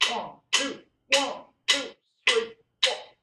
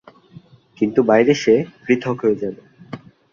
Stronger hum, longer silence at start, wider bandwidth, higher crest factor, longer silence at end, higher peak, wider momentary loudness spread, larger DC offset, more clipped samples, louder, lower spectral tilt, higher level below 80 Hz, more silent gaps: neither; second, 0 s vs 0.8 s; first, 13.5 kHz vs 7.2 kHz; first, 24 dB vs 18 dB; second, 0.2 s vs 0.35 s; about the same, -4 dBFS vs -2 dBFS; second, 11 LU vs 22 LU; neither; neither; second, -26 LUFS vs -18 LUFS; second, 0.5 dB/octave vs -6 dB/octave; second, -74 dBFS vs -60 dBFS; neither